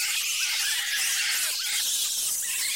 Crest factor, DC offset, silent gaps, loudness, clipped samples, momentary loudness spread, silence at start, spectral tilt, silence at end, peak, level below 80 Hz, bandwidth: 14 dB; under 0.1%; none; -24 LUFS; under 0.1%; 2 LU; 0 s; 5 dB/octave; 0 s; -14 dBFS; -72 dBFS; 16 kHz